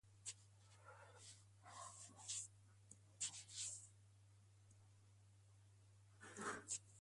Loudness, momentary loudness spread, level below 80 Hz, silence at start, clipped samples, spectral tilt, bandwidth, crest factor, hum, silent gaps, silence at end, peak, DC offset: -52 LUFS; 17 LU; -82 dBFS; 0.05 s; under 0.1%; -1.5 dB/octave; 11.5 kHz; 24 dB; none; none; 0 s; -34 dBFS; under 0.1%